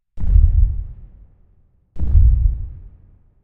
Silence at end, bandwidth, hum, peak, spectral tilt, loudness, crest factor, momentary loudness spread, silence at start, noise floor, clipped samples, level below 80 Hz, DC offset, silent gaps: 0.6 s; 1 kHz; none; 0 dBFS; -12 dB/octave; -19 LUFS; 16 dB; 16 LU; 0.15 s; -55 dBFS; under 0.1%; -18 dBFS; under 0.1%; none